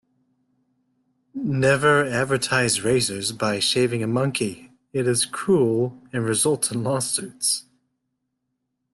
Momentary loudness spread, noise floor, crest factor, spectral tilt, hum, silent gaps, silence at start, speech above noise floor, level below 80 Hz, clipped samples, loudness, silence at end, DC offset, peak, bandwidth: 8 LU; -77 dBFS; 18 dB; -4 dB/octave; none; none; 1.35 s; 55 dB; -58 dBFS; under 0.1%; -22 LUFS; 1.3 s; under 0.1%; -6 dBFS; 12.5 kHz